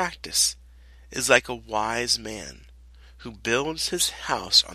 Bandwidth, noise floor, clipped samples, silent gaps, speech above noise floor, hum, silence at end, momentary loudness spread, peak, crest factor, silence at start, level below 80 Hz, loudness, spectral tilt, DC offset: 13.5 kHz; -49 dBFS; under 0.1%; none; 24 dB; none; 0 s; 18 LU; 0 dBFS; 26 dB; 0 s; -50 dBFS; -23 LUFS; -1 dB/octave; under 0.1%